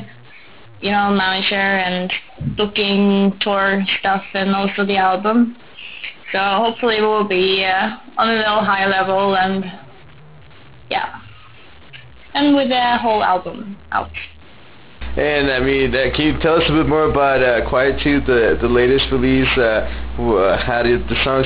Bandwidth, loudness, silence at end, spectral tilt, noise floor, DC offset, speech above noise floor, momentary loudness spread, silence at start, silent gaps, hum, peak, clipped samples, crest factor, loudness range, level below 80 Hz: 4 kHz; -16 LUFS; 0 s; -9.5 dB/octave; -44 dBFS; under 0.1%; 27 dB; 9 LU; 0 s; none; none; -4 dBFS; under 0.1%; 14 dB; 4 LU; -34 dBFS